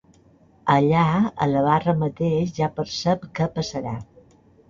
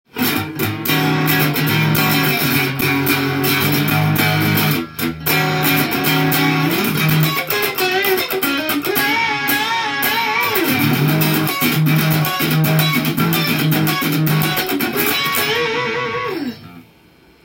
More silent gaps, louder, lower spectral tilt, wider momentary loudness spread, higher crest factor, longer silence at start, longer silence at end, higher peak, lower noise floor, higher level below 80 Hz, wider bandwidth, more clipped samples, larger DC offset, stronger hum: neither; second, -22 LUFS vs -16 LUFS; first, -7 dB/octave vs -4.5 dB/octave; first, 10 LU vs 4 LU; about the same, 18 dB vs 16 dB; first, 0.65 s vs 0.15 s; about the same, 0.65 s vs 0.65 s; second, -4 dBFS vs 0 dBFS; first, -55 dBFS vs -49 dBFS; about the same, -52 dBFS vs -52 dBFS; second, 7.4 kHz vs 17 kHz; neither; neither; neither